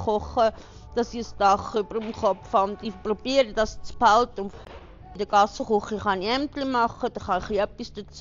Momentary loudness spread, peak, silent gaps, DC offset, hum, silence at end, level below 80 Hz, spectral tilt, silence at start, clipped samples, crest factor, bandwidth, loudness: 12 LU; -6 dBFS; none; under 0.1%; none; 0 s; -46 dBFS; -3 dB/octave; 0 s; under 0.1%; 18 dB; 7.4 kHz; -25 LUFS